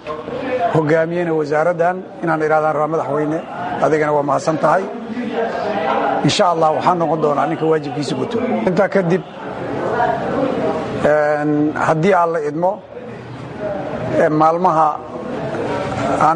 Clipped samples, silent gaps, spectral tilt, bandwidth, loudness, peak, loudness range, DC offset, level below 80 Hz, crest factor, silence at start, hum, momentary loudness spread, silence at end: under 0.1%; none; -6 dB/octave; 10 kHz; -17 LUFS; -2 dBFS; 2 LU; under 0.1%; -50 dBFS; 16 dB; 0 s; none; 10 LU; 0 s